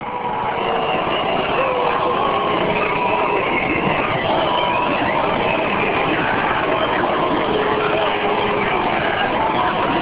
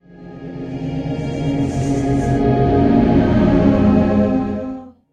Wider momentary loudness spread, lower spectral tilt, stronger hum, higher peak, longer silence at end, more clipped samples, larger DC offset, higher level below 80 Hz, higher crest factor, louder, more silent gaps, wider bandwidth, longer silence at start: second, 1 LU vs 15 LU; about the same, -9 dB/octave vs -8.5 dB/octave; neither; about the same, -4 dBFS vs -2 dBFS; second, 0 s vs 0.2 s; neither; neither; second, -44 dBFS vs -30 dBFS; about the same, 14 dB vs 14 dB; about the same, -18 LUFS vs -16 LUFS; neither; second, 4 kHz vs 9.4 kHz; about the same, 0 s vs 0.1 s